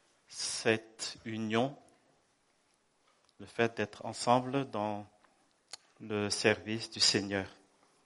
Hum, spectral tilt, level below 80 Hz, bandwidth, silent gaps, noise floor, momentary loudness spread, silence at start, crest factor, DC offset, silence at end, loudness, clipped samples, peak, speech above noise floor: none; -3.5 dB/octave; -76 dBFS; 11.5 kHz; none; -73 dBFS; 18 LU; 0.3 s; 26 dB; under 0.1%; 0.5 s; -33 LUFS; under 0.1%; -10 dBFS; 40 dB